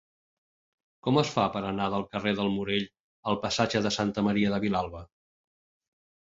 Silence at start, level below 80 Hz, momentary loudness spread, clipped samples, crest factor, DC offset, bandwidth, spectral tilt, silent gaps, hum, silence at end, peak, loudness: 1.05 s; -56 dBFS; 9 LU; under 0.1%; 22 dB; under 0.1%; 7.8 kHz; -5.5 dB/octave; 3.00-3.23 s; none; 1.3 s; -8 dBFS; -28 LUFS